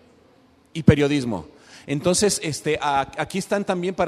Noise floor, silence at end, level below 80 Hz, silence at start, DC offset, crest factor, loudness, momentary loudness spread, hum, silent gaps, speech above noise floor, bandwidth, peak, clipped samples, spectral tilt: -56 dBFS; 0 s; -46 dBFS; 0.75 s; under 0.1%; 22 dB; -22 LUFS; 11 LU; none; none; 34 dB; 14 kHz; 0 dBFS; under 0.1%; -5 dB/octave